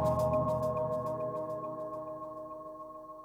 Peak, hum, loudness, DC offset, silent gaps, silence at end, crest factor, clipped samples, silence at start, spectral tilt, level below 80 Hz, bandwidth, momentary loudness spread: -20 dBFS; none; -35 LUFS; under 0.1%; none; 0 s; 14 dB; under 0.1%; 0 s; -8.5 dB/octave; -56 dBFS; 16.5 kHz; 15 LU